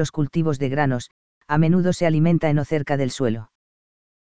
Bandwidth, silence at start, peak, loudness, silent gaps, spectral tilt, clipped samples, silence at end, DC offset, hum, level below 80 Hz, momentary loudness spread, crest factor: 8 kHz; 0 s; -4 dBFS; -21 LUFS; 1.11-1.41 s; -7 dB/octave; under 0.1%; 0.65 s; 2%; none; -50 dBFS; 7 LU; 16 dB